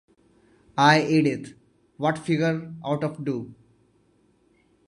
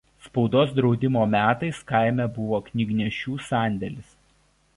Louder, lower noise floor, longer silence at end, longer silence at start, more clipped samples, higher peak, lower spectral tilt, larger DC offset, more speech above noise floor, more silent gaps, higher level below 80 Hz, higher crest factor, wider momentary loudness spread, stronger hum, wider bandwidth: about the same, -24 LUFS vs -24 LUFS; about the same, -63 dBFS vs -63 dBFS; first, 1.35 s vs 0.75 s; first, 0.75 s vs 0.25 s; neither; first, -2 dBFS vs -6 dBFS; second, -6 dB/octave vs -7.5 dB/octave; neither; about the same, 40 dB vs 40 dB; neither; second, -66 dBFS vs -54 dBFS; first, 24 dB vs 18 dB; first, 16 LU vs 10 LU; neither; about the same, 11.5 kHz vs 11.5 kHz